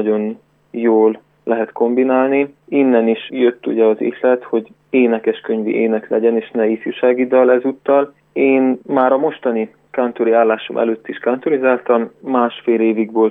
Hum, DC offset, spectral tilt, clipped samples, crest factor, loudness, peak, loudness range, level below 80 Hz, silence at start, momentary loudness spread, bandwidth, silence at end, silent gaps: none; under 0.1%; -9 dB/octave; under 0.1%; 14 dB; -16 LUFS; -2 dBFS; 2 LU; -70 dBFS; 0 s; 7 LU; 3.9 kHz; 0 s; none